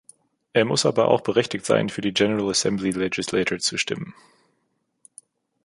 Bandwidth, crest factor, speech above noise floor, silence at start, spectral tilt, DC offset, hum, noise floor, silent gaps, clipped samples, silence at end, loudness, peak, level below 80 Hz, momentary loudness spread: 11.5 kHz; 22 dB; 50 dB; 0.55 s; -4 dB/octave; under 0.1%; none; -72 dBFS; none; under 0.1%; 1.55 s; -22 LUFS; -2 dBFS; -60 dBFS; 6 LU